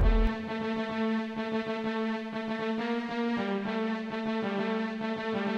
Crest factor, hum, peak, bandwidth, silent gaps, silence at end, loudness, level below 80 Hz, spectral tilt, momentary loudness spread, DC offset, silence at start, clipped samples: 16 dB; none; -14 dBFS; 7.4 kHz; none; 0 s; -32 LUFS; -36 dBFS; -7 dB/octave; 3 LU; under 0.1%; 0 s; under 0.1%